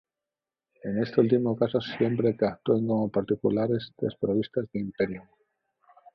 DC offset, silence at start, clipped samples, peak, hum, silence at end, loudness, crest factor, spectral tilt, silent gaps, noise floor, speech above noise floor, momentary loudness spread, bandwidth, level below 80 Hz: under 0.1%; 0.85 s; under 0.1%; -8 dBFS; none; 0.95 s; -27 LUFS; 20 dB; -9.5 dB/octave; none; under -90 dBFS; over 64 dB; 8 LU; 6 kHz; -62 dBFS